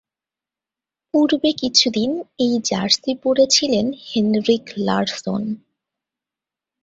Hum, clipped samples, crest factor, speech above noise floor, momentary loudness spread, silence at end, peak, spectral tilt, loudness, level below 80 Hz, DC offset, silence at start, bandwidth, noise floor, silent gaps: none; under 0.1%; 20 dB; 70 dB; 9 LU; 1.25 s; 0 dBFS; -3.5 dB/octave; -18 LUFS; -58 dBFS; under 0.1%; 1.15 s; 8 kHz; -89 dBFS; none